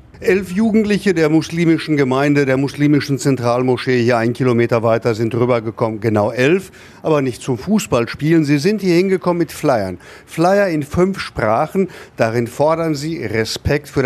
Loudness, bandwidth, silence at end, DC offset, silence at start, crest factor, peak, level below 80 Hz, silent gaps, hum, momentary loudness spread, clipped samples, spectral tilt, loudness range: -16 LUFS; 14 kHz; 0 s; under 0.1%; 0.15 s; 16 dB; 0 dBFS; -44 dBFS; none; none; 6 LU; under 0.1%; -6.5 dB/octave; 2 LU